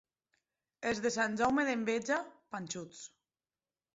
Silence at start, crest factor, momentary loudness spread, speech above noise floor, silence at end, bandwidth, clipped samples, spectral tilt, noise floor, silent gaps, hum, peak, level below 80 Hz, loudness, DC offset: 0.8 s; 18 dB; 16 LU; over 56 dB; 0.9 s; 8 kHz; under 0.1%; -3 dB/octave; under -90 dBFS; none; none; -18 dBFS; -70 dBFS; -34 LUFS; under 0.1%